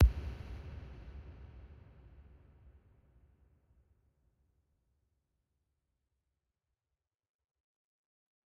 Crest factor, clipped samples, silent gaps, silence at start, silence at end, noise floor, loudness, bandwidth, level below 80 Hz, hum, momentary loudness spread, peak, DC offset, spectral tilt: 26 dB; under 0.1%; none; 0 s; 6.35 s; under -90 dBFS; -41 LUFS; 4.9 kHz; -42 dBFS; none; 18 LU; -14 dBFS; under 0.1%; -8.5 dB/octave